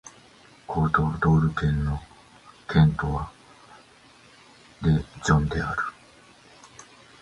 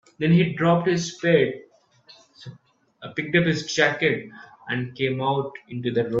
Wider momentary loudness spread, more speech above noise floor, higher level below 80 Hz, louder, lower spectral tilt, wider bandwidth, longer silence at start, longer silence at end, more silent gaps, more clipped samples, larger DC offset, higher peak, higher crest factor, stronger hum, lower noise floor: second, 13 LU vs 22 LU; about the same, 31 dB vs 33 dB; first, -38 dBFS vs -62 dBFS; about the same, -24 LUFS vs -23 LUFS; first, -7 dB/octave vs -5.5 dB/octave; first, 10 kHz vs 7.8 kHz; second, 0.05 s vs 0.2 s; first, 0.4 s vs 0 s; neither; neither; neither; about the same, -4 dBFS vs -4 dBFS; about the same, 22 dB vs 20 dB; neither; about the same, -53 dBFS vs -55 dBFS